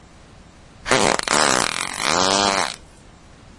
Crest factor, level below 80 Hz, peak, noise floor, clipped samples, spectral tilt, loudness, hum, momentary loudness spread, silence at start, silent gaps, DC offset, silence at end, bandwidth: 22 dB; -48 dBFS; 0 dBFS; -46 dBFS; under 0.1%; -1.5 dB/octave; -18 LUFS; none; 9 LU; 0.85 s; none; under 0.1%; 0.75 s; 11.5 kHz